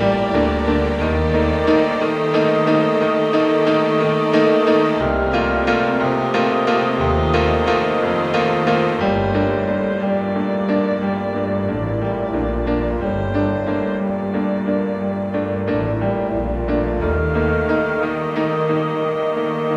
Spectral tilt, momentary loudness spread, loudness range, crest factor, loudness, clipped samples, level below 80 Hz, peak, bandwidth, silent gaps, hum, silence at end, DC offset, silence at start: -7.5 dB/octave; 5 LU; 5 LU; 16 dB; -18 LUFS; under 0.1%; -32 dBFS; -2 dBFS; 9.2 kHz; none; none; 0 s; under 0.1%; 0 s